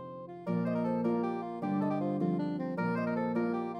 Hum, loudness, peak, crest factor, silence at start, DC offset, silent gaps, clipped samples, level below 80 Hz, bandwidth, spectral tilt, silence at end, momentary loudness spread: none; -33 LUFS; -18 dBFS; 14 dB; 0 s; under 0.1%; none; under 0.1%; -82 dBFS; 6 kHz; -9.5 dB/octave; 0 s; 5 LU